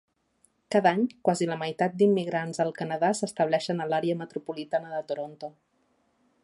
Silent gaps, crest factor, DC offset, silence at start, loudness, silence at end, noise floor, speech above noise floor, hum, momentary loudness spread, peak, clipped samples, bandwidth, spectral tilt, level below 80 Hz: none; 20 dB; under 0.1%; 0.7 s; -27 LUFS; 0.95 s; -70 dBFS; 43 dB; none; 12 LU; -8 dBFS; under 0.1%; 11.5 kHz; -5.5 dB/octave; -76 dBFS